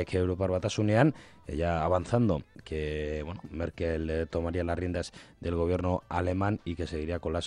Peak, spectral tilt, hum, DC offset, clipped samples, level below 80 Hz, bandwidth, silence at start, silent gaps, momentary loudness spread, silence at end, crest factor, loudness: -10 dBFS; -7 dB/octave; none; under 0.1%; under 0.1%; -48 dBFS; 10.5 kHz; 0 s; none; 10 LU; 0 s; 20 dB; -31 LUFS